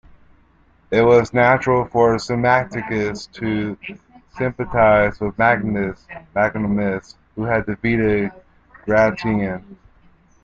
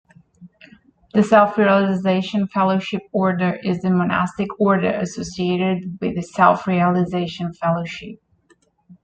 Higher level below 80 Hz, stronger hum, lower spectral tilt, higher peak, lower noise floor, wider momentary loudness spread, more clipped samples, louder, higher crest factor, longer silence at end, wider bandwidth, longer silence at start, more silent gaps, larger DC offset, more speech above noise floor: first, -44 dBFS vs -56 dBFS; neither; about the same, -7 dB/octave vs -7 dB/octave; about the same, -2 dBFS vs -2 dBFS; second, -55 dBFS vs -59 dBFS; first, 14 LU vs 10 LU; neither; about the same, -19 LUFS vs -19 LUFS; about the same, 18 dB vs 18 dB; first, 0.7 s vs 0.1 s; second, 7.8 kHz vs 8.6 kHz; first, 0.9 s vs 0.4 s; neither; neither; second, 37 dB vs 41 dB